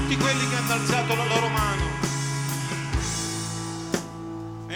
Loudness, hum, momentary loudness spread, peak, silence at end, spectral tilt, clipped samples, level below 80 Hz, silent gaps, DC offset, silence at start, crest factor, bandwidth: -25 LUFS; none; 9 LU; -8 dBFS; 0 s; -4 dB/octave; under 0.1%; -38 dBFS; none; under 0.1%; 0 s; 18 dB; over 20 kHz